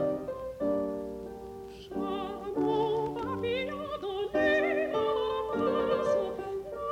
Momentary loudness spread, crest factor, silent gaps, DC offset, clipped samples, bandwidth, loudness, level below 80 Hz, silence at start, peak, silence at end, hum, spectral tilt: 12 LU; 14 dB; none; under 0.1%; under 0.1%; 16 kHz; -31 LUFS; -56 dBFS; 0 s; -16 dBFS; 0 s; none; -6 dB/octave